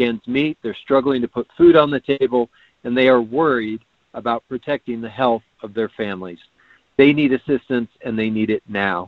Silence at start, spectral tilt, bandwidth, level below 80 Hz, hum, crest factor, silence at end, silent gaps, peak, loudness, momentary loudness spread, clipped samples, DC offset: 0 s; -8.5 dB/octave; 4.8 kHz; -54 dBFS; none; 18 dB; 0 s; none; 0 dBFS; -19 LUFS; 14 LU; under 0.1%; under 0.1%